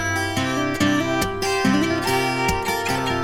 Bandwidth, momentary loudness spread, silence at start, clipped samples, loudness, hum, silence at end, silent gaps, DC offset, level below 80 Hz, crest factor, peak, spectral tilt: 17.5 kHz; 3 LU; 0 s; under 0.1%; -21 LUFS; none; 0 s; none; under 0.1%; -42 dBFS; 16 dB; -6 dBFS; -4.5 dB/octave